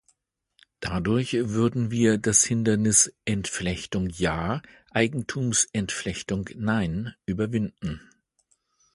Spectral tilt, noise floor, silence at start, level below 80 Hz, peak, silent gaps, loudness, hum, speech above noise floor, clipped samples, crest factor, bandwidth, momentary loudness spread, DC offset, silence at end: -4 dB/octave; -71 dBFS; 0.8 s; -48 dBFS; -4 dBFS; none; -25 LUFS; none; 46 dB; under 0.1%; 22 dB; 11.5 kHz; 12 LU; under 0.1%; 0.95 s